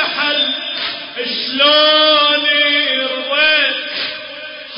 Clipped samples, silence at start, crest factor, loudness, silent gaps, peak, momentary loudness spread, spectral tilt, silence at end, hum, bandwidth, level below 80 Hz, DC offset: under 0.1%; 0 s; 14 dB; -13 LUFS; none; -2 dBFS; 13 LU; -5 dB/octave; 0 s; none; 5.4 kHz; -64 dBFS; under 0.1%